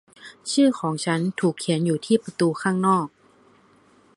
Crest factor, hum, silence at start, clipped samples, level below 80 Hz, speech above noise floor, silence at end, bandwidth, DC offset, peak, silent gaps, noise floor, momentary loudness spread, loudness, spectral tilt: 18 dB; none; 0.25 s; under 0.1%; -70 dBFS; 35 dB; 1.1 s; 11.5 kHz; under 0.1%; -6 dBFS; none; -57 dBFS; 6 LU; -22 LUFS; -5.5 dB/octave